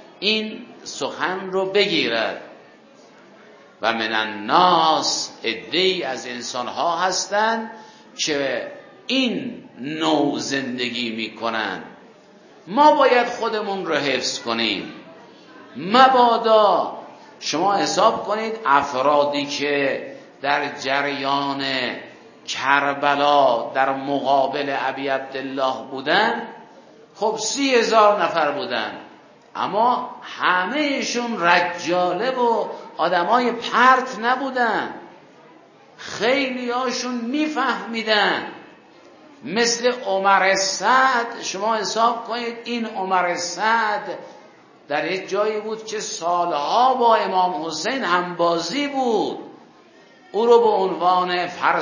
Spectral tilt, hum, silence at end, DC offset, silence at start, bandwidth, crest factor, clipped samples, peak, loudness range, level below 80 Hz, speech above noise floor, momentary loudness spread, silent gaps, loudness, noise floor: -3 dB/octave; none; 0 s; under 0.1%; 0.2 s; 7.4 kHz; 20 dB; under 0.1%; 0 dBFS; 5 LU; -70 dBFS; 29 dB; 12 LU; none; -20 LUFS; -49 dBFS